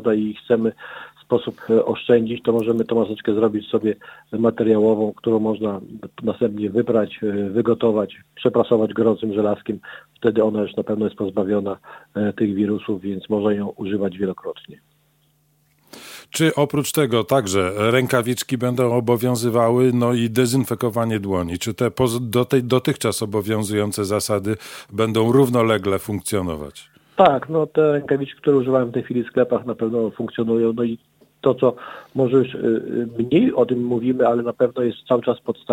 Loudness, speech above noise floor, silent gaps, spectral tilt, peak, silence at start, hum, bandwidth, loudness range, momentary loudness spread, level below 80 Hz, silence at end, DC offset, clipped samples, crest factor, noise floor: -20 LUFS; 42 dB; none; -6 dB/octave; 0 dBFS; 0 s; none; 17 kHz; 4 LU; 9 LU; -56 dBFS; 0 s; under 0.1%; under 0.1%; 20 dB; -62 dBFS